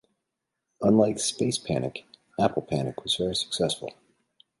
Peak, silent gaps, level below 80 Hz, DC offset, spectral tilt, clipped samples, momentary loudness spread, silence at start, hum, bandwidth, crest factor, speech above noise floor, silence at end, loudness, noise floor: -8 dBFS; none; -58 dBFS; under 0.1%; -4.5 dB/octave; under 0.1%; 13 LU; 0.8 s; none; 11.5 kHz; 20 dB; 57 dB; 0.7 s; -26 LUFS; -83 dBFS